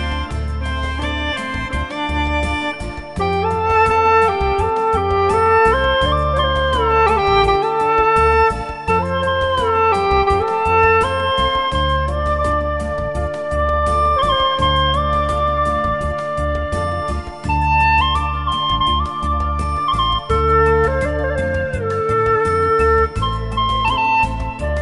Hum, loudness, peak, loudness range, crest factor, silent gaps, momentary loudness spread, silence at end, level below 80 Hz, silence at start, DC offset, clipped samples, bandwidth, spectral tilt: none; -17 LUFS; -2 dBFS; 3 LU; 16 dB; none; 8 LU; 0 s; -26 dBFS; 0 s; under 0.1%; under 0.1%; 11.5 kHz; -5.5 dB/octave